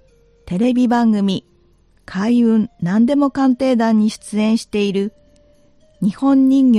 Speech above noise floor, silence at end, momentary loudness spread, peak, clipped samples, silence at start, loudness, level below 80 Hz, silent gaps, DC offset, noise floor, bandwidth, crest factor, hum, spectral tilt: 39 dB; 0 s; 8 LU; -4 dBFS; under 0.1%; 0.45 s; -16 LUFS; -52 dBFS; none; under 0.1%; -54 dBFS; 11 kHz; 12 dB; none; -7 dB/octave